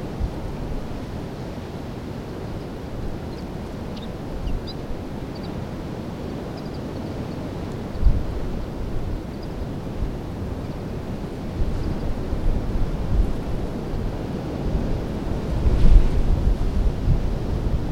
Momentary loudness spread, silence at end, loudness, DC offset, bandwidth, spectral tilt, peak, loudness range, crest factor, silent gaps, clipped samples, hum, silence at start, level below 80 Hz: 9 LU; 0 s; -28 LUFS; under 0.1%; 8.8 kHz; -8 dB/octave; 0 dBFS; 8 LU; 22 dB; none; under 0.1%; none; 0 s; -24 dBFS